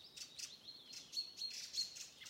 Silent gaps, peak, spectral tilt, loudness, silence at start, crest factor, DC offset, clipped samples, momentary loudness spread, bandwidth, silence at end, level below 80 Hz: none; -30 dBFS; 1.5 dB/octave; -46 LUFS; 0 s; 20 dB; under 0.1%; under 0.1%; 10 LU; 16 kHz; 0 s; -86 dBFS